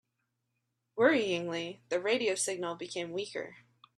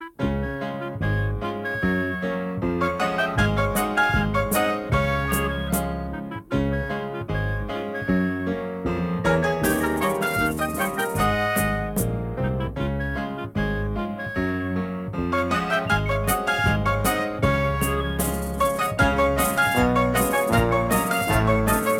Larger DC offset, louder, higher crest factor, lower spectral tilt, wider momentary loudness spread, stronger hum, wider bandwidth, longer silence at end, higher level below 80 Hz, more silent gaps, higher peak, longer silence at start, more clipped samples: neither; second, -32 LUFS vs -23 LUFS; about the same, 20 dB vs 18 dB; second, -3 dB/octave vs -5.5 dB/octave; first, 13 LU vs 8 LU; neither; second, 13 kHz vs 17.5 kHz; first, 0.4 s vs 0 s; second, -80 dBFS vs -34 dBFS; neither; second, -12 dBFS vs -6 dBFS; first, 0.95 s vs 0 s; neither